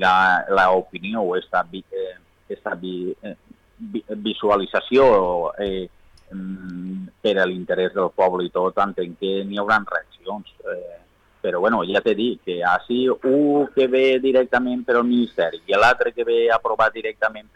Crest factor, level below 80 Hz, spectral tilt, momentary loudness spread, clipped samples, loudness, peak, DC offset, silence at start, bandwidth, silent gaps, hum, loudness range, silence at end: 14 dB; -54 dBFS; -6 dB/octave; 15 LU; under 0.1%; -20 LUFS; -6 dBFS; under 0.1%; 0 s; 9.8 kHz; none; none; 6 LU; 0.15 s